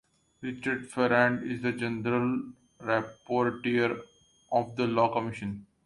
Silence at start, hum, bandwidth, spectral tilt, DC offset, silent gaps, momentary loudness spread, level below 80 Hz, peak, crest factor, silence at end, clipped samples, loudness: 0.4 s; none; 11.5 kHz; -6.5 dB/octave; under 0.1%; none; 13 LU; -64 dBFS; -8 dBFS; 22 dB; 0.2 s; under 0.1%; -29 LUFS